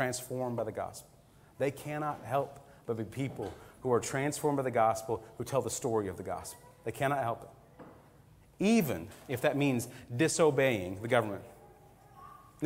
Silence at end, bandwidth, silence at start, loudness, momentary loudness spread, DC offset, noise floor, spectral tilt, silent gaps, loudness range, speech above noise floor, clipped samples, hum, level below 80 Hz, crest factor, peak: 0 s; 16 kHz; 0 s; -33 LUFS; 15 LU; under 0.1%; -59 dBFS; -5 dB/octave; none; 6 LU; 27 dB; under 0.1%; none; -64 dBFS; 22 dB; -10 dBFS